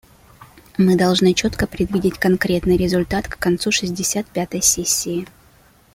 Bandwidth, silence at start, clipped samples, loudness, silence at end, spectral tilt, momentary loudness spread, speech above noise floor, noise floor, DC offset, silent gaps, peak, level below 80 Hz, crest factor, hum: 16.5 kHz; 0.4 s; under 0.1%; -18 LUFS; 0.7 s; -4 dB/octave; 9 LU; 33 dB; -52 dBFS; under 0.1%; none; -2 dBFS; -40 dBFS; 18 dB; none